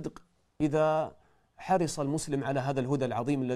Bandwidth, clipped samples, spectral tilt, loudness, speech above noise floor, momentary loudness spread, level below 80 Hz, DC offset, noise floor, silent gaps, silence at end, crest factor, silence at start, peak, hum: 14.5 kHz; under 0.1%; -6 dB/octave; -30 LUFS; 27 dB; 8 LU; -60 dBFS; under 0.1%; -56 dBFS; none; 0 s; 16 dB; 0 s; -16 dBFS; none